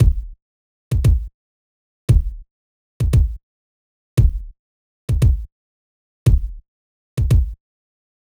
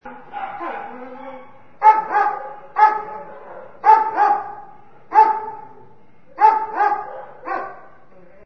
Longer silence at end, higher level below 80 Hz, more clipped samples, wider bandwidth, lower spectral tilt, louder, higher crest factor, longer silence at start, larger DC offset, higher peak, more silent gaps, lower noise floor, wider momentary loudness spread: first, 0.8 s vs 0.65 s; first, -22 dBFS vs -62 dBFS; neither; first, over 20 kHz vs 6.2 kHz; first, -8 dB/octave vs -5 dB/octave; about the same, -20 LUFS vs -18 LUFS; about the same, 16 dB vs 20 dB; about the same, 0 s vs 0.05 s; second, under 0.1% vs 0.7%; second, -4 dBFS vs 0 dBFS; first, 0.42-0.91 s, 1.34-2.08 s, 2.51-3.00 s, 3.43-4.17 s, 4.59-5.08 s, 5.52-6.26 s, 6.68-7.17 s vs none; first, under -90 dBFS vs -51 dBFS; second, 17 LU vs 21 LU